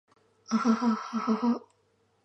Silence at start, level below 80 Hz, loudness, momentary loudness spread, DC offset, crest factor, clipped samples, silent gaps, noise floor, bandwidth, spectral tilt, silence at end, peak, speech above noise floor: 0.5 s; -84 dBFS; -29 LUFS; 6 LU; under 0.1%; 16 dB; under 0.1%; none; -70 dBFS; 8 kHz; -6 dB/octave; 0.65 s; -14 dBFS; 42 dB